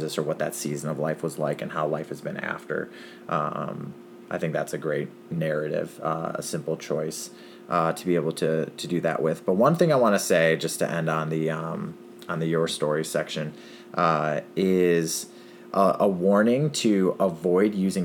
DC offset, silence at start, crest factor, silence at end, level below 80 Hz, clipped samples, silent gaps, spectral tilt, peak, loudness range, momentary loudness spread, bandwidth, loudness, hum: under 0.1%; 0 s; 20 dB; 0 s; -68 dBFS; under 0.1%; none; -5.5 dB/octave; -6 dBFS; 7 LU; 13 LU; 19 kHz; -25 LUFS; none